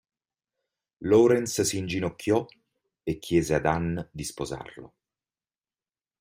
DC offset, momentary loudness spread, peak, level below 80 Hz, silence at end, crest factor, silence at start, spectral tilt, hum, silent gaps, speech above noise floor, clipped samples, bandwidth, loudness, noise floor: under 0.1%; 16 LU; -8 dBFS; -54 dBFS; 1.35 s; 20 dB; 1 s; -5 dB/octave; none; none; over 64 dB; under 0.1%; 16 kHz; -26 LUFS; under -90 dBFS